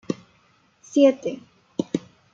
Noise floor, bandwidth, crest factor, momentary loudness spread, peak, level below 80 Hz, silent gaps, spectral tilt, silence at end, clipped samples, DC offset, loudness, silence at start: -61 dBFS; 7.6 kHz; 20 dB; 15 LU; -6 dBFS; -72 dBFS; none; -6 dB/octave; 0.35 s; under 0.1%; under 0.1%; -24 LUFS; 0.1 s